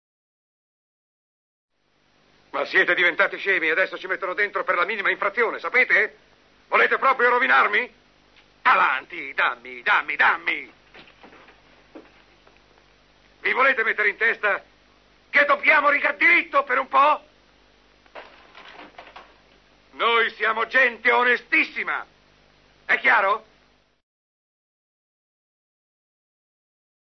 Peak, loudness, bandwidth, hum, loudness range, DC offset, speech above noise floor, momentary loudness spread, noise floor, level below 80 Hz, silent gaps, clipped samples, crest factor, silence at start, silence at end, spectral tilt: -6 dBFS; -20 LUFS; 6.4 kHz; none; 7 LU; under 0.1%; 44 dB; 10 LU; -65 dBFS; -68 dBFS; none; under 0.1%; 18 dB; 2.55 s; 3.8 s; -3.5 dB/octave